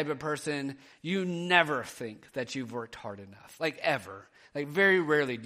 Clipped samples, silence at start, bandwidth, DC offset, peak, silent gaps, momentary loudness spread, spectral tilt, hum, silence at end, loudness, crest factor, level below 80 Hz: under 0.1%; 0 s; 15 kHz; under 0.1%; -8 dBFS; none; 18 LU; -5 dB/octave; none; 0 s; -30 LUFS; 24 dB; -72 dBFS